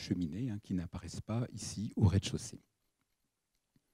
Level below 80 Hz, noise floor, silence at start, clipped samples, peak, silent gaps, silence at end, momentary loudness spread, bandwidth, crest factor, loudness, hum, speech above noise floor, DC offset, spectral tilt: -56 dBFS; -84 dBFS; 0 s; under 0.1%; -16 dBFS; none; 1.35 s; 13 LU; 12.5 kHz; 20 dB; -37 LUFS; none; 48 dB; under 0.1%; -6 dB/octave